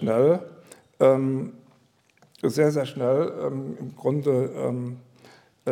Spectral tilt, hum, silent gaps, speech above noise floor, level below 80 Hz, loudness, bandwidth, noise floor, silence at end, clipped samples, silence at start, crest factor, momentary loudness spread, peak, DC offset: -7.5 dB/octave; none; none; 39 dB; -74 dBFS; -24 LUFS; 15 kHz; -62 dBFS; 0 s; under 0.1%; 0 s; 18 dB; 15 LU; -6 dBFS; under 0.1%